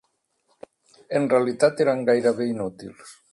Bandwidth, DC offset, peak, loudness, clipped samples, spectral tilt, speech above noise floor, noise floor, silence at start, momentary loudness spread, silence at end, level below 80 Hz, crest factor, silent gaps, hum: 11.5 kHz; under 0.1%; -6 dBFS; -22 LUFS; under 0.1%; -6 dB/octave; 48 dB; -70 dBFS; 1.1 s; 13 LU; 0.2 s; -66 dBFS; 18 dB; none; none